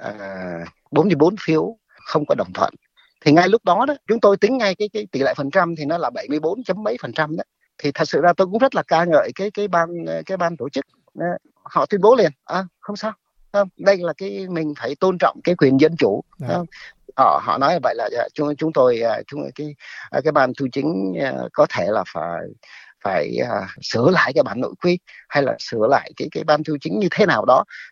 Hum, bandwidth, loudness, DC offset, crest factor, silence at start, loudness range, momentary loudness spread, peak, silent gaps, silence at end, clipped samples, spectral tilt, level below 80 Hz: none; 7.4 kHz; -19 LUFS; under 0.1%; 18 dB; 0 s; 3 LU; 13 LU; -2 dBFS; none; 0.05 s; under 0.1%; -6.5 dB/octave; -64 dBFS